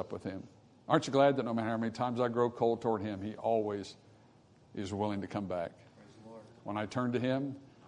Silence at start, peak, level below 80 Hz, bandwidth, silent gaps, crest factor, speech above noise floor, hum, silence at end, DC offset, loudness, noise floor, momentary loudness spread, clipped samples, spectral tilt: 0 s; -12 dBFS; -74 dBFS; 10.5 kHz; none; 22 dB; 29 dB; none; 0 s; under 0.1%; -34 LUFS; -62 dBFS; 19 LU; under 0.1%; -6.5 dB/octave